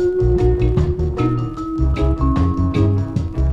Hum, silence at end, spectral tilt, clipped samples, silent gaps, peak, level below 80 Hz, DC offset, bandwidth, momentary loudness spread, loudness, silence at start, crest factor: none; 0 s; -9.5 dB/octave; under 0.1%; none; -4 dBFS; -22 dBFS; under 0.1%; 7.4 kHz; 5 LU; -18 LUFS; 0 s; 12 dB